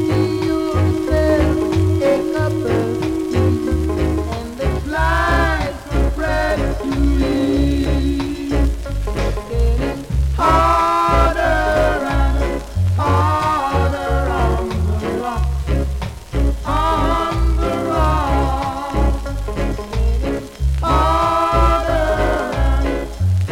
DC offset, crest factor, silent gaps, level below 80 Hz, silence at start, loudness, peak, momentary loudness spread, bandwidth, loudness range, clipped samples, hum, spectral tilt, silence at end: under 0.1%; 16 dB; none; -22 dBFS; 0 s; -18 LUFS; 0 dBFS; 7 LU; 15 kHz; 3 LU; under 0.1%; none; -7 dB/octave; 0 s